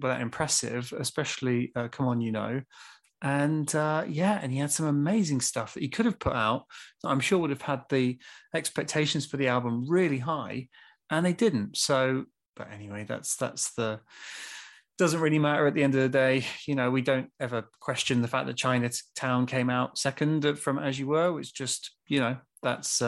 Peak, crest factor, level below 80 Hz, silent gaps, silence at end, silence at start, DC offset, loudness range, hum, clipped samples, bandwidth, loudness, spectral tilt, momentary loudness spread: -10 dBFS; 18 dB; -62 dBFS; 12.48-12.53 s; 0 s; 0 s; under 0.1%; 3 LU; none; under 0.1%; 13 kHz; -28 LUFS; -4.5 dB/octave; 10 LU